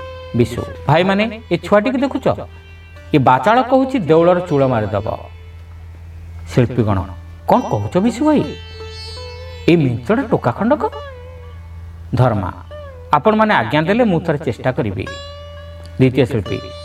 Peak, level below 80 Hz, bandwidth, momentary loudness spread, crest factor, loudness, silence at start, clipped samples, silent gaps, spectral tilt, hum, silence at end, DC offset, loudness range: 0 dBFS; -40 dBFS; 13.5 kHz; 21 LU; 16 dB; -16 LUFS; 0 s; under 0.1%; none; -7.5 dB/octave; none; 0 s; under 0.1%; 4 LU